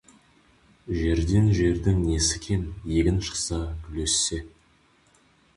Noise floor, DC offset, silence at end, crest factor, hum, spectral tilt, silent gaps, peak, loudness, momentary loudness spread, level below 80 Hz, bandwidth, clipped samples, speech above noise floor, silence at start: -61 dBFS; under 0.1%; 1.1 s; 16 dB; none; -4.5 dB/octave; none; -10 dBFS; -25 LUFS; 9 LU; -34 dBFS; 11.5 kHz; under 0.1%; 37 dB; 0.85 s